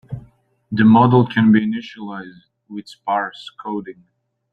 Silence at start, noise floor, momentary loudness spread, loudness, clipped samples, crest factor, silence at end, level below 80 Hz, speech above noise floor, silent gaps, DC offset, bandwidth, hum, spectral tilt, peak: 0.1 s; -51 dBFS; 23 LU; -16 LUFS; under 0.1%; 18 dB; 0.6 s; -54 dBFS; 34 dB; none; under 0.1%; 5.2 kHz; none; -8.5 dB/octave; -2 dBFS